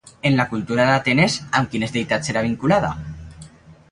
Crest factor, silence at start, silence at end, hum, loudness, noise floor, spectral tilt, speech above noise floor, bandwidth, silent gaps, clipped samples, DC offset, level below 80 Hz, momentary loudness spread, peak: 18 dB; 0.05 s; 0.2 s; none; -19 LUFS; -44 dBFS; -5.5 dB/octave; 25 dB; 11 kHz; none; under 0.1%; under 0.1%; -46 dBFS; 10 LU; -2 dBFS